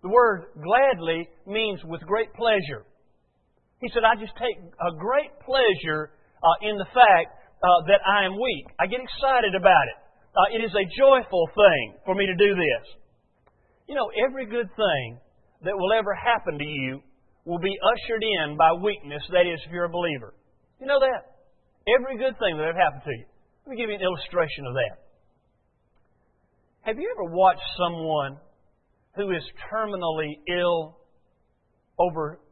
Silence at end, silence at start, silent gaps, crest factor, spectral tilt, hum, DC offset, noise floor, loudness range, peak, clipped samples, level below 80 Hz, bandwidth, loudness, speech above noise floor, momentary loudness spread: 0.15 s; 0.05 s; none; 22 dB; -9 dB/octave; none; under 0.1%; -68 dBFS; 8 LU; -2 dBFS; under 0.1%; -54 dBFS; 4.4 kHz; -23 LUFS; 45 dB; 14 LU